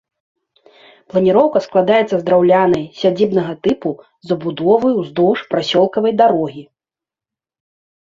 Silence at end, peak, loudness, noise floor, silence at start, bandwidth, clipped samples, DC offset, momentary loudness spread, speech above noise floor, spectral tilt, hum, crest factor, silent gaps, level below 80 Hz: 1.5 s; 0 dBFS; -15 LUFS; -89 dBFS; 1.15 s; 7.6 kHz; under 0.1%; under 0.1%; 9 LU; 74 dB; -7 dB/octave; none; 16 dB; none; -56 dBFS